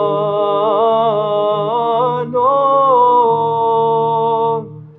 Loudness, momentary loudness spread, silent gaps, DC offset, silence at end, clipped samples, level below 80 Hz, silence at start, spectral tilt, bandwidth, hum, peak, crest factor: -14 LUFS; 5 LU; none; under 0.1%; 0.1 s; under 0.1%; -64 dBFS; 0 s; -9 dB/octave; 4.1 kHz; none; -2 dBFS; 12 dB